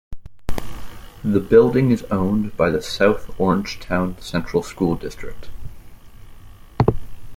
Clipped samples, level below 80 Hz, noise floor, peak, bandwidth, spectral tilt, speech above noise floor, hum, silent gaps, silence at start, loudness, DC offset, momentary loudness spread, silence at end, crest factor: under 0.1%; -36 dBFS; -40 dBFS; -2 dBFS; 16.5 kHz; -7 dB/octave; 21 dB; none; none; 0.1 s; -20 LUFS; under 0.1%; 23 LU; 0 s; 18 dB